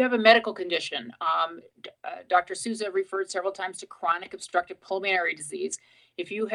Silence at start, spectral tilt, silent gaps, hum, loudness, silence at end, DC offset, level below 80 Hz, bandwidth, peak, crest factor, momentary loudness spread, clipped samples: 0 s; -2 dB/octave; none; none; -27 LUFS; 0 s; under 0.1%; -78 dBFS; 12 kHz; -4 dBFS; 24 dB; 16 LU; under 0.1%